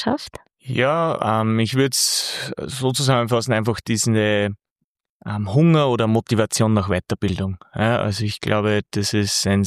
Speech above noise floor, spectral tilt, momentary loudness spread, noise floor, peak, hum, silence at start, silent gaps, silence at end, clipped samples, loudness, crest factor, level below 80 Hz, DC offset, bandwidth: 58 dB; -4.5 dB/octave; 10 LU; -78 dBFS; -2 dBFS; none; 0 s; 4.71-4.76 s, 4.84-4.95 s, 5.09-5.20 s; 0 s; under 0.1%; -20 LUFS; 18 dB; -50 dBFS; under 0.1%; 15 kHz